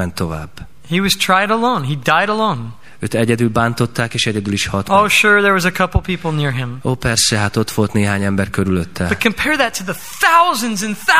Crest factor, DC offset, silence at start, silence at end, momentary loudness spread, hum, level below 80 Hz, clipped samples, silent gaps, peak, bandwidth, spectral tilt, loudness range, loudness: 16 dB; 2%; 0 s; 0 s; 10 LU; none; -38 dBFS; under 0.1%; none; 0 dBFS; 16 kHz; -4 dB/octave; 3 LU; -15 LUFS